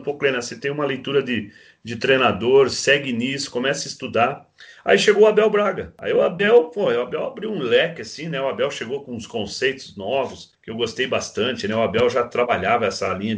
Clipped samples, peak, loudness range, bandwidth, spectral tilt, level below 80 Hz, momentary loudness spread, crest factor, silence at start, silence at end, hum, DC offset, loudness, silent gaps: under 0.1%; -2 dBFS; 6 LU; 9.8 kHz; -4 dB/octave; -58 dBFS; 13 LU; 18 dB; 0 s; 0 s; none; under 0.1%; -20 LUFS; none